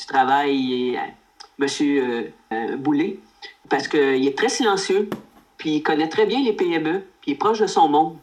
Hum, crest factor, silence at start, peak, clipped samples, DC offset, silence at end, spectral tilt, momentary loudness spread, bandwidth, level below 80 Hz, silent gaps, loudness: none; 16 dB; 0 s; -6 dBFS; under 0.1%; under 0.1%; 0.05 s; -4 dB/octave; 11 LU; 12.5 kHz; -66 dBFS; none; -21 LUFS